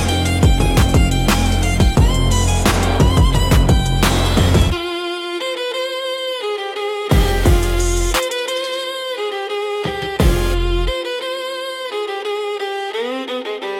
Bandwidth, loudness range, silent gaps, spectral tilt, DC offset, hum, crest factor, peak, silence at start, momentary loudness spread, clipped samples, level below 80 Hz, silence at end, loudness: 17 kHz; 6 LU; none; -5 dB/octave; under 0.1%; none; 14 dB; -2 dBFS; 0 s; 8 LU; under 0.1%; -20 dBFS; 0 s; -18 LUFS